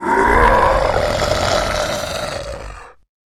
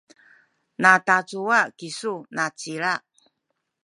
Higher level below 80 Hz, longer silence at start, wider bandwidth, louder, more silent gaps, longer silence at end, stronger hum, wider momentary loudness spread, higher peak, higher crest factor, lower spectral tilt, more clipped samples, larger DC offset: first, -28 dBFS vs -78 dBFS; second, 0 s vs 0.8 s; first, 16 kHz vs 11.5 kHz; first, -16 LUFS vs -22 LUFS; neither; second, 0.45 s vs 0.85 s; neither; first, 16 LU vs 13 LU; about the same, 0 dBFS vs -2 dBFS; second, 16 dB vs 24 dB; about the same, -4 dB/octave vs -3.5 dB/octave; neither; neither